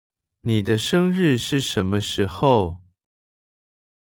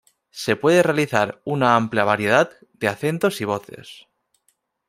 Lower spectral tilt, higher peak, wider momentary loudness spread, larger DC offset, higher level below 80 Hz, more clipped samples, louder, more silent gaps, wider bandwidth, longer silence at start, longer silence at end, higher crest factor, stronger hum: about the same, -5.5 dB/octave vs -5.5 dB/octave; about the same, -4 dBFS vs -2 dBFS; second, 8 LU vs 12 LU; neither; first, -52 dBFS vs -64 dBFS; neither; about the same, -21 LUFS vs -20 LUFS; neither; first, 18.5 kHz vs 16 kHz; about the same, 0.45 s vs 0.35 s; first, 1.35 s vs 0.95 s; about the same, 20 dB vs 20 dB; neither